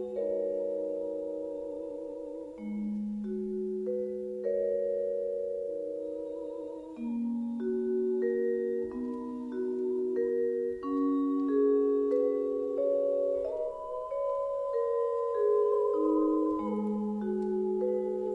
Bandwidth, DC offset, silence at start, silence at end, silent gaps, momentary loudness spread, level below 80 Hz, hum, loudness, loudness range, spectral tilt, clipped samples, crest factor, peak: 7.4 kHz; under 0.1%; 0 s; 0 s; none; 10 LU; -66 dBFS; none; -32 LUFS; 6 LU; -9.5 dB/octave; under 0.1%; 14 dB; -16 dBFS